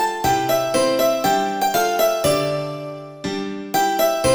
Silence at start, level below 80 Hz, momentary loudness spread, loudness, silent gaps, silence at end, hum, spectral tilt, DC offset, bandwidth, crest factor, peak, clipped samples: 0 s; -48 dBFS; 10 LU; -19 LUFS; none; 0 s; none; -3.5 dB/octave; 0.1%; over 20 kHz; 14 dB; -6 dBFS; under 0.1%